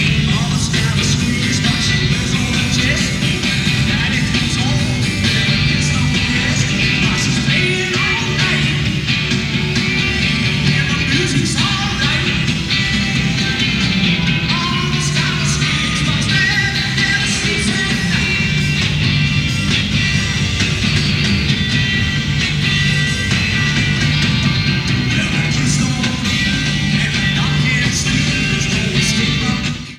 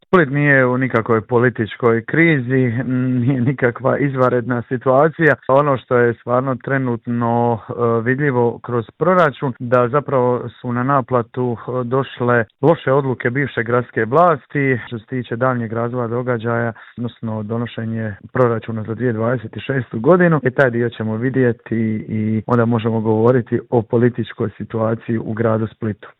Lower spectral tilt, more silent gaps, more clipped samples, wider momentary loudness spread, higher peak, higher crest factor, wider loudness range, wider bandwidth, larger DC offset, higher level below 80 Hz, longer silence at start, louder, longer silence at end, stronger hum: second, -4 dB/octave vs -10 dB/octave; neither; neither; second, 2 LU vs 9 LU; about the same, -2 dBFS vs 0 dBFS; about the same, 14 dB vs 16 dB; second, 1 LU vs 5 LU; first, 14.5 kHz vs 4.1 kHz; neither; first, -30 dBFS vs -56 dBFS; about the same, 0 s vs 0.1 s; first, -15 LUFS vs -18 LUFS; about the same, 0 s vs 0.1 s; neither